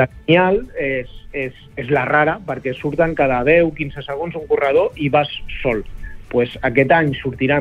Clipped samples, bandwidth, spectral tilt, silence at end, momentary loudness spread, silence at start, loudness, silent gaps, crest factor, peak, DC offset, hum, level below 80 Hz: under 0.1%; 7 kHz; -8 dB/octave; 0 s; 12 LU; 0 s; -18 LUFS; none; 16 dB; -2 dBFS; under 0.1%; none; -38 dBFS